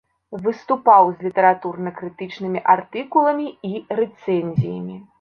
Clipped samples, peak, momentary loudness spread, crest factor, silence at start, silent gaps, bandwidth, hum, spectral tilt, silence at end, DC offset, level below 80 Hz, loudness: under 0.1%; -2 dBFS; 16 LU; 18 dB; 0.3 s; none; 6.6 kHz; none; -9 dB/octave; 0.2 s; under 0.1%; -62 dBFS; -19 LUFS